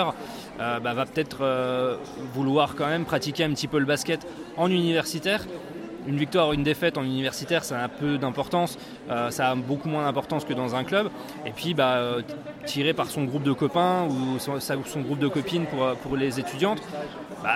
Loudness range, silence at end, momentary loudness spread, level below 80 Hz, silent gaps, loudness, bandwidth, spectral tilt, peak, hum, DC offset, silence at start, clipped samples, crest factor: 2 LU; 0 s; 9 LU; -56 dBFS; none; -26 LUFS; 16.5 kHz; -5 dB/octave; -8 dBFS; none; under 0.1%; 0 s; under 0.1%; 18 dB